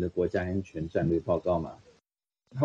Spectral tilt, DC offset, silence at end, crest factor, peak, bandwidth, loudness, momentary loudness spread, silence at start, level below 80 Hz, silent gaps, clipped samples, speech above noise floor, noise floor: -9 dB/octave; under 0.1%; 0 s; 18 dB; -12 dBFS; 7.8 kHz; -30 LUFS; 8 LU; 0 s; -52 dBFS; none; under 0.1%; 53 dB; -82 dBFS